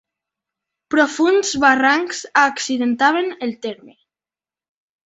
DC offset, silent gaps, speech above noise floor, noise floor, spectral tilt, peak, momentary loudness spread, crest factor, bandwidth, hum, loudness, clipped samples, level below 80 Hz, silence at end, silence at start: under 0.1%; none; over 73 dB; under -90 dBFS; -2 dB/octave; -2 dBFS; 11 LU; 18 dB; 8.2 kHz; none; -17 LUFS; under 0.1%; -60 dBFS; 1.15 s; 0.9 s